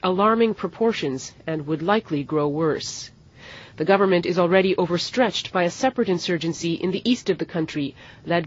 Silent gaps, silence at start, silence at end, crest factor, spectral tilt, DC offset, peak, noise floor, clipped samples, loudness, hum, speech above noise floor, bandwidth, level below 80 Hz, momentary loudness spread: none; 0 s; 0 s; 18 dB; -5 dB/octave; under 0.1%; -4 dBFS; -44 dBFS; under 0.1%; -22 LUFS; none; 22 dB; 8 kHz; -58 dBFS; 13 LU